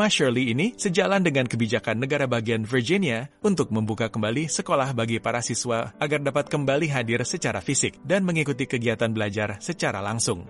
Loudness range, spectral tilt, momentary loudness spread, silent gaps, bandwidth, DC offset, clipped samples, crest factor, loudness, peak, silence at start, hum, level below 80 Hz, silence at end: 2 LU; -4.5 dB/octave; 5 LU; none; 11.5 kHz; under 0.1%; under 0.1%; 16 dB; -24 LUFS; -8 dBFS; 0 s; none; -58 dBFS; 0 s